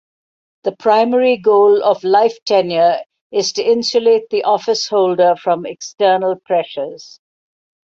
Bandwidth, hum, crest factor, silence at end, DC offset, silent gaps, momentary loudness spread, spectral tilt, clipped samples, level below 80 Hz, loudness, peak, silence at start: 7.8 kHz; none; 14 dB; 0.95 s; under 0.1%; 2.42-2.46 s, 3.21-3.30 s; 11 LU; -4 dB/octave; under 0.1%; -66 dBFS; -15 LUFS; -2 dBFS; 0.65 s